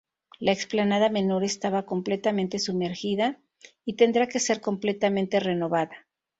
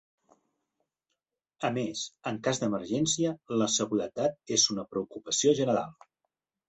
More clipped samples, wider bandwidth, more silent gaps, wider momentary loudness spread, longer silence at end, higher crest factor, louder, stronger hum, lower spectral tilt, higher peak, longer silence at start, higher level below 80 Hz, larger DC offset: neither; about the same, 8 kHz vs 8.4 kHz; neither; second, 6 LU vs 10 LU; second, 0.4 s vs 0.75 s; about the same, 20 dB vs 20 dB; first, -26 LUFS vs -29 LUFS; neither; about the same, -4.5 dB/octave vs -3.5 dB/octave; first, -6 dBFS vs -10 dBFS; second, 0.4 s vs 1.6 s; about the same, -68 dBFS vs -70 dBFS; neither